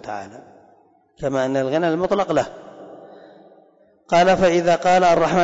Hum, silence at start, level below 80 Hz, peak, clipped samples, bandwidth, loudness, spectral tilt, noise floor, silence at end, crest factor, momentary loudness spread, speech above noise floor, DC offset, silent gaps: none; 0 s; -50 dBFS; -8 dBFS; under 0.1%; 8 kHz; -18 LUFS; -5.5 dB/octave; -55 dBFS; 0 s; 12 dB; 18 LU; 37 dB; under 0.1%; none